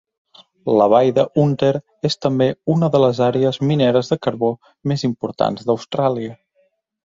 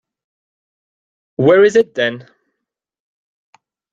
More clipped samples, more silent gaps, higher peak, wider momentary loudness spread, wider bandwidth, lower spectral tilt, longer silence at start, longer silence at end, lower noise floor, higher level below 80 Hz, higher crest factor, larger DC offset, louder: neither; neither; about the same, -2 dBFS vs -2 dBFS; second, 9 LU vs 20 LU; about the same, 7.8 kHz vs 7.8 kHz; first, -7.5 dB/octave vs -6 dB/octave; second, 0.65 s vs 1.4 s; second, 0.85 s vs 1.7 s; second, -63 dBFS vs -78 dBFS; about the same, -58 dBFS vs -62 dBFS; about the same, 16 dB vs 18 dB; neither; second, -18 LUFS vs -13 LUFS